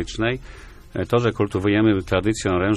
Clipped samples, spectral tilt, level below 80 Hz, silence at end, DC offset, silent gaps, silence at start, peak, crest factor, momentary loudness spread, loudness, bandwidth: under 0.1%; -6 dB/octave; -40 dBFS; 0 s; under 0.1%; none; 0 s; -4 dBFS; 16 dB; 11 LU; -21 LUFS; 12.5 kHz